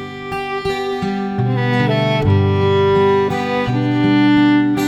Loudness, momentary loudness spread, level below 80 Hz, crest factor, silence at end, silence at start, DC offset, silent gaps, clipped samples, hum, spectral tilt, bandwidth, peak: -16 LUFS; 8 LU; -42 dBFS; 12 dB; 0 s; 0 s; under 0.1%; none; under 0.1%; none; -7.5 dB/octave; 12 kHz; -4 dBFS